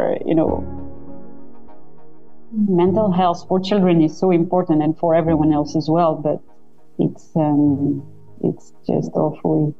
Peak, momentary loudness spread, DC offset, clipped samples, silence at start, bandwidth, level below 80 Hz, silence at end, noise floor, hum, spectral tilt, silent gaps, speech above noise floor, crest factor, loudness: -6 dBFS; 13 LU; 2%; under 0.1%; 0 s; 7.6 kHz; -46 dBFS; 0 s; -46 dBFS; none; -8.5 dB/octave; none; 29 dB; 14 dB; -18 LUFS